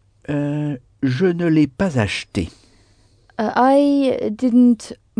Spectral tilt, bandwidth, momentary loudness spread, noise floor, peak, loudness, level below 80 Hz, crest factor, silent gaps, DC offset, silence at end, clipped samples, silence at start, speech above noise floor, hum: -7 dB/octave; 10 kHz; 12 LU; -54 dBFS; -4 dBFS; -18 LUFS; -48 dBFS; 14 dB; none; under 0.1%; 0.25 s; under 0.1%; 0.3 s; 38 dB; none